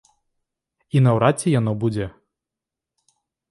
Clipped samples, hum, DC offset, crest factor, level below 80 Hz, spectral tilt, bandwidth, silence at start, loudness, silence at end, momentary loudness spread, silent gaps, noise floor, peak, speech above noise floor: under 0.1%; none; under 0.1%; 20 dB; -52 dBFS; -7 dB/octave; 11.5 kHz; 0.95 s; -20 LUFS; 1.4 s; 11 LU; none; -87 dBFS; -2 dBFS; 68 dB